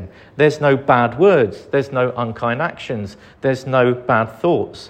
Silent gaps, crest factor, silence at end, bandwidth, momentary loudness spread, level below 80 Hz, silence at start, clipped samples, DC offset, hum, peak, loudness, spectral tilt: none; 16 dB; 0 s; 9.2 kHz; 12 LU; -54 dBFS; 0 s; under 0.1%; under 0.1%; none; 0 dBFS; -17 LUFS; -7 dB/octave